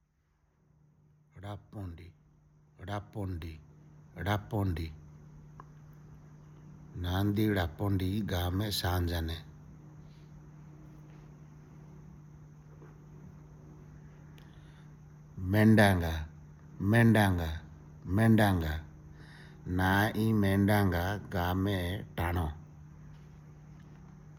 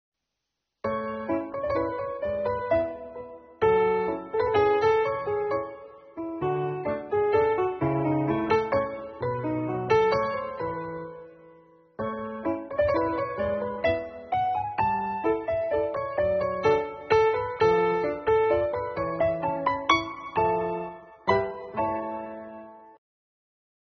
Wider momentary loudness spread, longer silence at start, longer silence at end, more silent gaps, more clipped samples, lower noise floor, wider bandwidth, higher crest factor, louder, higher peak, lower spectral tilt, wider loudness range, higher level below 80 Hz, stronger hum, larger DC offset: first, 27 LU vs 12 LU; first, 1.35 s vs 0.85 s; second, 0.05 s vs 1.05 s; neither; neither; second, -72 dBFS vs -83 dBFS; first, 17.5 kHz vs 6.4 kHz; about the same, 20 dB vs 20 dB; second, -30 LUFS vs -27 LUFS; second, -12 dBFS vs -6 dBFS; first, -6.5 dB/octave vs -4.5 dB/octave; first, 24 LU vs 5 LU; about the same, -50 dBFS vs -54 dBFS; neither; neither